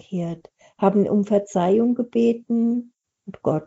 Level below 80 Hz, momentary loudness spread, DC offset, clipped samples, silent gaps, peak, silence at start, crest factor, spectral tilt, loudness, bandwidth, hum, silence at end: -66 dBFS; 10 LU; under 0.1%; under 0.1%; none; -4 dBFS; 0.1 s; 18 dB; -8.5 dB/octave; -21 LUFS; 8 kHz; none; 0 s